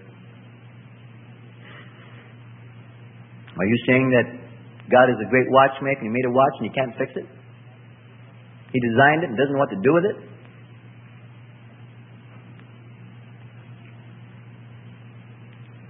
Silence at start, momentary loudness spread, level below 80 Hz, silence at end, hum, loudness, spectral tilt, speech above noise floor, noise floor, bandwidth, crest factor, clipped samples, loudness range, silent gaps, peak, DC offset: 0.25 s; 27 LU; -66 dBFS; 0.1 s; none; -20 LUFS; -11 dB/octave; 27 dB; -46 dBFS; 3.7 kHz; 22 dB; under 0.1%; 8 LU; none; -2 dBFS; under 0.1%